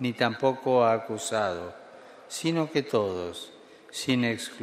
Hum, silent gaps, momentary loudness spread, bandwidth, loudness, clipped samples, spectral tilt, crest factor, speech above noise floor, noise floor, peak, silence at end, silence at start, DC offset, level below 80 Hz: none; none; 16 LU; 15.5 kHz; -27 LUFS; under 0.1%; -4.5 dB/octave; 20 dB; 22 dB; -49 dBFS; -8 dBFS; 0 s; 0 s; under 0.1%; -68 dBFS